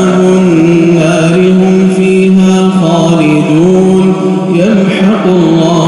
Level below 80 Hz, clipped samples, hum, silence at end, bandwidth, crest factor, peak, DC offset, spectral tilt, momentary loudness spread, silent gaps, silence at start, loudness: -42 dBFS; under 0.1%; none; 0 s; 11 kHz; 6 dB; 0 dBFS; under 0.1%; -7 dB/octave; 2 LU; none; 0 s; -7 LUFS